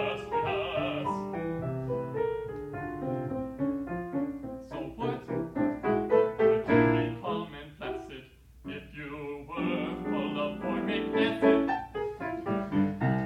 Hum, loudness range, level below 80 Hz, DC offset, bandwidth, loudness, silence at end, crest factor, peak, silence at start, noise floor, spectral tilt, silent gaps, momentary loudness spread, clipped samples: none; 7 LU; -54 dBFS; under 0.1%; 10 kHz; -31 LUFS; 0 s; 18 dB; -12 dBFS; 0 s; -51 dBFS; -8 dB/octave; none; 15 LU; under 0.1%